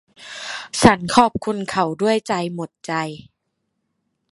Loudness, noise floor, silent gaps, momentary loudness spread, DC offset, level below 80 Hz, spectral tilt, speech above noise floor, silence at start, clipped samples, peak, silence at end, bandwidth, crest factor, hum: -19 LUFS; -74 dBFS; none; 16 LU; under 0.1%; -48 dBFS; -4.5 dB/octave; 55 dB; 0.2 s; under 0.1%; 0 dBFS; 1.15 s; 11.5 kHz; 22 dB; none